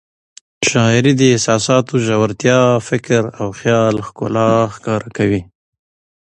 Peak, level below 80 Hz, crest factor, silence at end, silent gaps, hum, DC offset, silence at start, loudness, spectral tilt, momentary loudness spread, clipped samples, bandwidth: 0 dBFS; -48 dBFS; 16 dB; 0.8 s; none; none; under 0.1%; 0.6 s; -15 LUFS; -5 dB/octave; 8 LU; under 0.1%; 10.5 kHz